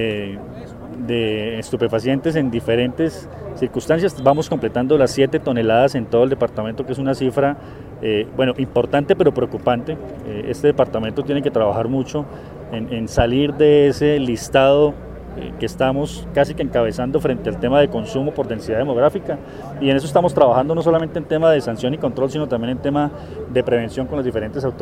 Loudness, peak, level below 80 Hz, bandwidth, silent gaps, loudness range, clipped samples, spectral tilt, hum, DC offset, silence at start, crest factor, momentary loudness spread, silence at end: -19 LUFS; 0 dBFS; -42 dBFS; 15 kHz; none; 3 LU; under 0.1%; -6.5 dB/octave; none; under 0.1%; 0 s; 18 dB; 13 LU; 0 s